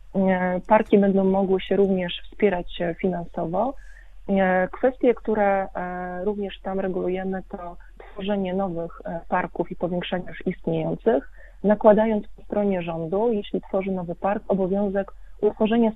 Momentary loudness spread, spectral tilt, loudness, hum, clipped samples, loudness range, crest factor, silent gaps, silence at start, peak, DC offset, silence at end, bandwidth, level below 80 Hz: 11 LU; -9.5 dB/octave; -24 LUFS; none; under 0.1%; 6 LU; 20 dB; none; 0.05 s; -2 dBFS; under 0.1%; 0 s; 4 kHz; -46 dBFS